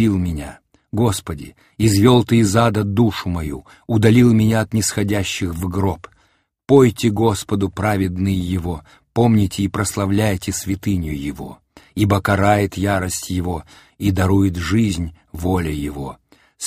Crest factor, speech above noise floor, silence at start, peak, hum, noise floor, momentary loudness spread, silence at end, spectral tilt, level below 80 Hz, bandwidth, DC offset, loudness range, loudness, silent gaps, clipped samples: 18 dB; 44 dB; 0 s; 0 dBFS; none; -61 dBFS; 16 LU; 0 s; -6 dB/octave; -38 dBFS; 15.5 kHz; under 0.1%; 4 LU; -18 LUFS; none; under 0.1%